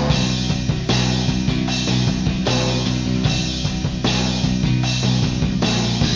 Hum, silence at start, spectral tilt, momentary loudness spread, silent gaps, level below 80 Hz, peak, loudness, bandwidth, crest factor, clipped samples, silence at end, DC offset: none; 0 s; -5 dB/octave; 2 LU; none; -30 dBFS; -4 dBFS; -19 LUFS; 7.6 kHz; 14 dB; under 0.1%; 0 s; under 0.1%